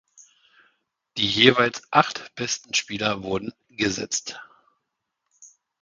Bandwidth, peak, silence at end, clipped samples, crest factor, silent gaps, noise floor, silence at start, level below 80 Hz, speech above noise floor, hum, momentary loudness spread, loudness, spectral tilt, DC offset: 10 kHz; 0 dBFS; 0.35 s; under 0.1%; 26 dB; none; -80 dBFS; 1.15 s; -58 dBFS; 56 dB; none; 16 LU; -22 LUFS; -3 dB/octave; under 0.1%